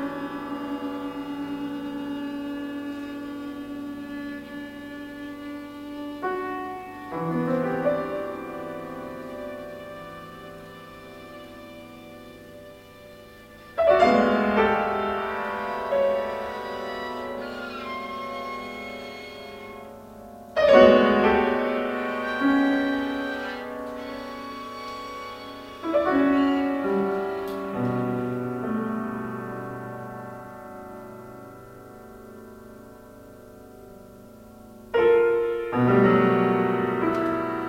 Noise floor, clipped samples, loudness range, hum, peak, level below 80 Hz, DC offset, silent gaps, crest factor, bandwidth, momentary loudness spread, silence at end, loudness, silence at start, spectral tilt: -46 dBFS; under 0.1%; 19 LU; none; -2 dBFS; -54 dBFS; under 0.1%; none; 24 dB; 16.5 kHz; 24 LU; 0 s; -25 LUFS; 0 s; -7 dB/octave